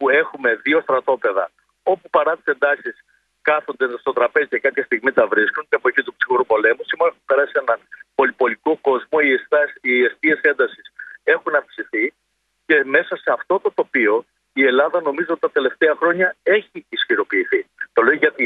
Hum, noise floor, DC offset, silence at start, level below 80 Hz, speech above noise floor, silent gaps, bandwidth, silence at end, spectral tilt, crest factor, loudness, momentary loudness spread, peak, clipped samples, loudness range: none; -70 dBFS; under 0.1%; 0 s; -70 dBFS; 52 dB; none; 4.7 kHz; 0 s; -6.5 dB/octave; 18 dB; -18 LUFS; 7 LU; 0 dBFS; under 0.1%; 2 LU